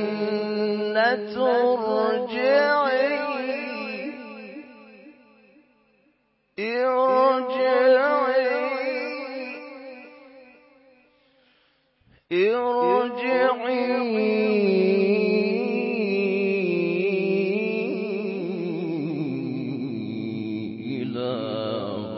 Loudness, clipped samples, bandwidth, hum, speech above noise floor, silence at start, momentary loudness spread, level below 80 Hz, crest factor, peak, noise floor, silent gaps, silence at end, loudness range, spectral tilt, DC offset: -23 LUFS; under 0.1%; 5.8 kHz; none; 46 dB; 0 s; 12 LU; -74 dBFS; 18 dB; -6 dBFS; -67 dBFS; none; 0 s; 10 LU; -10 dB/octave; under 0.1%